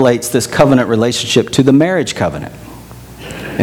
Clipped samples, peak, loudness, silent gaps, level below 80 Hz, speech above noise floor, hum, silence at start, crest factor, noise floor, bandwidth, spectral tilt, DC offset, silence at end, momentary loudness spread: 0.2%; 0 dBFS; -12 LUFS; none; -40 dBFS; 21 dB; none; 0 s; 14 dB; -33 dBFS; 19 kHz; -5 dB/octave; under 0.1%; 0 s; 21 LU